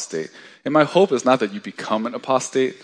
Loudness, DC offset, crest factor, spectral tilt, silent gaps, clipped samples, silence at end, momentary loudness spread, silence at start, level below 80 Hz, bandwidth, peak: -20 LUFS; under 0.1%; 20 dB; -4.5 dB/octave; none; under 0.1%; 0.1 s; 14 LU; 0 s; -70 dBFS; 10.5 kHz; 0 dBFS